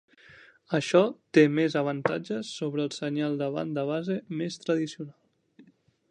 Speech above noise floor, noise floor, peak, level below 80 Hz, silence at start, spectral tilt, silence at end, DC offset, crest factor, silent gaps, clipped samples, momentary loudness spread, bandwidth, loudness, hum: 33 dB; -60 dBFS; -6 dBFS; -76 dBFS; 0.3 s; -6 dB/octave; 0.5 s; under 0.1%; 22 dB; none; under 0.1%; 11 LU; 10 kHz; -28 LUFS; none